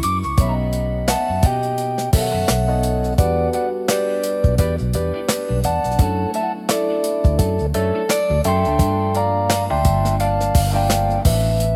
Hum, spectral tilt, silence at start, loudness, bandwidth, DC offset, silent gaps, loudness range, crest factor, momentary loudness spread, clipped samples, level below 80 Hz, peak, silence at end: none; -6 dB/octave; 0 s; -19 LUFS; 17.5 kHz; under 0.1%; none; 2 LU; 16 dB; 4 LU; under 0.1%; -26 dBFS; -2 dBFS; 0 s